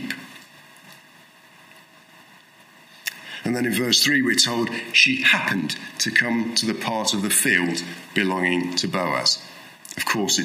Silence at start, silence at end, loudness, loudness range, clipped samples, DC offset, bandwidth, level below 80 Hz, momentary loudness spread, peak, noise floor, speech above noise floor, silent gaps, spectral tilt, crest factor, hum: 0 s; 0 s; -20 LUFS; 13 LU; under 0.1%; under 0.1%; 16 kHz; -70 dBFS; 15 LU; -2 dBFS; -51 dBFS; 29 dB; none; -2 dB/octave; 22 dB; none